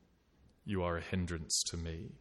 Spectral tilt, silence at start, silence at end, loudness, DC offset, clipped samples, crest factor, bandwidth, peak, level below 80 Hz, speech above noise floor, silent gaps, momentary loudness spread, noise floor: -3.5 dB/octave; 0.65 s; 0.05 s; -37 LUFS; under 0.1%; under 0.1%; 18 dB; 12.5 kHz; -22 dBFS; -54 dBFS; 30 dB; none; 10 LU; -68 dBFS